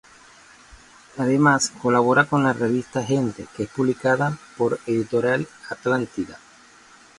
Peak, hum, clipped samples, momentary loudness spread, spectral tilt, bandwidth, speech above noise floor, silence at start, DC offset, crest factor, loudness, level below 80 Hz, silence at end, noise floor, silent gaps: -2 dBFS; none; under 0.1%; 12 LU; -5.5 dB/octave; 11.5 kHz; 29 dB; 1.15 s; under 0.1%; 20 dB; -22 LUFS; -58 dBFS; 0.85 s; -50 dBFS; none